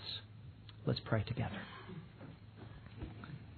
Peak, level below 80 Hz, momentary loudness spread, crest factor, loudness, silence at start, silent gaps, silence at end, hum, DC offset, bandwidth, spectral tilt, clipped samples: -18 dBFS; -60 dBFS; 17 LU; 26 dB; -42 LUFS; 0 s; none; 0 s; none; under 0.1%; 4.6 kHz; -5 dB/octave; under 0.1%